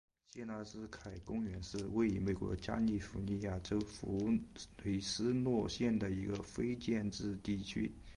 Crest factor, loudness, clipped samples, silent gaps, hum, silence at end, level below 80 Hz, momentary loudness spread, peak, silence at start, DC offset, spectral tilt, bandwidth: 16 dB; -39 LUFS; under 0.1%; none; none; 0 s; -56 dBFS; 11 LU; -24 dBFS; 0.35 s; under 0.1%; -6 dB/octave; 11 kHz